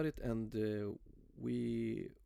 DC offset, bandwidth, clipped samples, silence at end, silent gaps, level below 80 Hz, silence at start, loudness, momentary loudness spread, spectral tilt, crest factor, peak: under 0.1%; 13.5 kHz; under 0.1%; 0.1 s; none; -58 dBFS; 0 s; -41 LUFS; 8 LU; -8.5 dB/octave; 14 dB; -26 dBFS